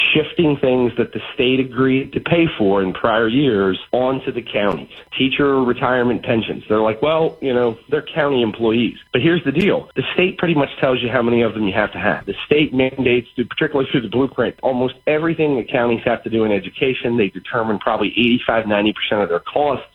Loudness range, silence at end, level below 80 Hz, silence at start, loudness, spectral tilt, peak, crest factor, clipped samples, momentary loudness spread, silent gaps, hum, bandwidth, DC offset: 1 LU; 0.1 s; -48 dBFS; 0 s; -18 LUFS; -8 dB/octave; -2 dBFS; 16 dB; under 0.1%; 4 LU; none; none; 5.4 kHz; under 0.1%